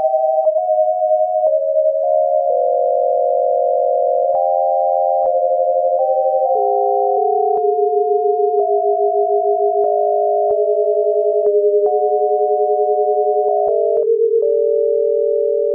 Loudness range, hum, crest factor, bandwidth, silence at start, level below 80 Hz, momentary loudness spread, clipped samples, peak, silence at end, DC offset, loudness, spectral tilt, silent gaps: 0 LU; none; 10 dB; 1.2 kHz; 0 s; -70 dBFS; 1 LU; under 0.1%; -6 dBFS; 0 s; under 0.1%; -16 LUFS; -10 dB/octave; none